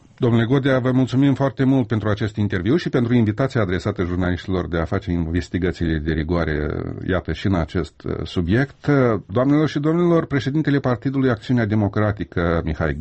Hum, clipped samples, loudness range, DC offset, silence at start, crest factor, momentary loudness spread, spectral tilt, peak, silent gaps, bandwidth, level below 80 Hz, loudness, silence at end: none; under 0.1%; 4 LU; under 0.1%; 0.2 s; 14 dB; 6 LU; -8 dB/octave; -6 dBFS; none; 8.4 kHz; -36 dBFS; -20 LUFS; 0 s